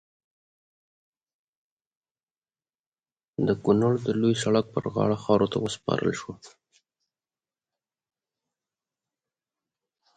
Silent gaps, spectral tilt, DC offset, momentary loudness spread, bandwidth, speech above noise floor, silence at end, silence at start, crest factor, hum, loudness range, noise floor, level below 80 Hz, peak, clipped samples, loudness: none; -6.5 dB/octave; under 0.1%; 7 LU; 9.4 kHz; over 65 dB; 3.7 s; 3.4 s; 22 dB; none; 10 LU; under -90 dBFS; -62 dBFS; -8 dBFS; under 0.1%; -25 LUFS